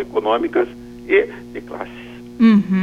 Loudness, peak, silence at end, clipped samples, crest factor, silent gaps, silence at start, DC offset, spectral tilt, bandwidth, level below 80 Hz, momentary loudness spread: -17 LUFS; -2 dBFS; 0 s; under 0.1%; 16 dB; none; 0 s; under 0.1%; -8 dB/octave; 7 kHz; -50 dBFS; 21 LU